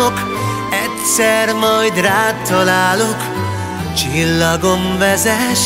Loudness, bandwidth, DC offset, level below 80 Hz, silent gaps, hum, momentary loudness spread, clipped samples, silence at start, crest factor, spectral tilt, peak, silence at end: -14 LUFS; 16.5 kHz; under 0.1%; -40 dBFS; none; none; 7 LU; under 0.1%; 0 s; 14 dB; -3.5 dB/octave; 0 dBFS; 0 s